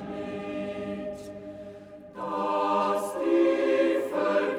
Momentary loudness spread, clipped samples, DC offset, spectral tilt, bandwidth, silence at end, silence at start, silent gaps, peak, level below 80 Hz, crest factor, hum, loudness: 18 LU; under 0.1%; under 0.1%; -5.5 dB/octave; 15 kHz; 0 s; 0 s; none; -12 dBFS; -64 dBFS; 14 dB; none; -27 LUFS